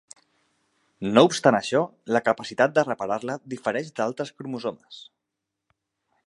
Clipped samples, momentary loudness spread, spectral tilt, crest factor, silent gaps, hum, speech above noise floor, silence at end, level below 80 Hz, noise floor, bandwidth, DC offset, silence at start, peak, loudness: under 0.1%; 15 LU; -5 dB/octave; 24 dB; none; none; 60 dB; 1.25 s; -70 dBFS; -83 dBFS; 11.5 kHz; under 0.1%; 1 s; -2 dBFS; -24 LUFS